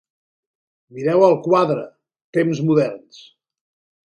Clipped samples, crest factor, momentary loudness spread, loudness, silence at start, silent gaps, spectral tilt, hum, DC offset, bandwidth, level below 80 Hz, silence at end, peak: under 0.1%; 18 dB; 11 LU; -18 LUFS; 0.95 s; 2.24-2.33 s; -7.5 dB/octave; none; under 0.1%; 10 kHz; -68 dBFS; 1.1 s; -2 dBFS